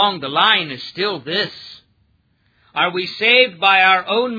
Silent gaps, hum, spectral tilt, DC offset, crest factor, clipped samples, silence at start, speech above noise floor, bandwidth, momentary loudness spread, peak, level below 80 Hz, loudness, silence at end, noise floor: none; none; -4.5 dB/octave; under 0.1%; 18 dB; under 0.1%; 0 s; 44 dB; 5 kHz; 13 LU; 0 dBFS; -66 dBFS; -15 LUFS; 0 s; -61 dBFS